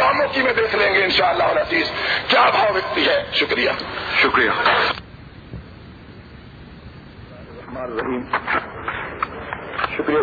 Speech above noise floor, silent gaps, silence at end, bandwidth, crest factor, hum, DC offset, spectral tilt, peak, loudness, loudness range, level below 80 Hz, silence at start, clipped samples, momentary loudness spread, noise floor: 21 dB; none; 0 s; 5 kHz; 16 dB; none; under 0.1%; -5 dB/octave; -6 dBFS; -18 LUFS; 13 LU; -46 dBFS; 0 s; under 0.1%; 16 LU; -40 dBFS